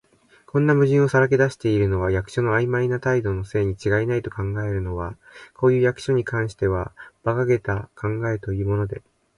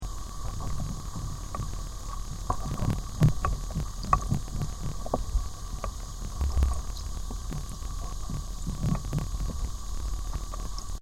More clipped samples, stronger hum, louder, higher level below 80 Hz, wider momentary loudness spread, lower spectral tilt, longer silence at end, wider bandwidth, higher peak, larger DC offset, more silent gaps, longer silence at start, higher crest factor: neither; neither; first, -22 LUFS vs -33 LUFS; second, -42 dBFS vs -34 dBFS; about the same, 10 LU vs 11 LU; first, -8 dB/octave vs -5.5 dB/octave; first, 0.4 s vs 0 s; second, 11.5 kHz vs 16 kHz; about the same, -4 dBFS vs -6 dBFS; neither; neither; first, 0.55 s vs 0 s; second, 16 dB vs 24 dB